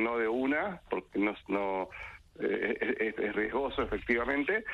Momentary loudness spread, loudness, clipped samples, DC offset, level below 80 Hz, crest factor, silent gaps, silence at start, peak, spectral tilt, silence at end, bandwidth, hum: 7 LU; -32 LUFS; under 0.1%; under 0.1%; -54 dBFS; 18 dB; none; 0 s; -14 dBFS; -7 dB/octave; 0 s; 10.5 kHz; none